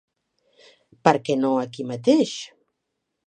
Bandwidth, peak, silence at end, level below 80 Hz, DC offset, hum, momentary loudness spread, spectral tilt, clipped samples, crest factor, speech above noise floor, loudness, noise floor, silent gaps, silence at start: 9.6 kHz; 0 dBFS; 0.8 s; -68 dBFS; under 0.1%; none; 12 LU; -5.5 dB/octave; under 0.1%; 24 dB; 58 dB; -22 LUFS; -79 dBFS; none; 1.05 s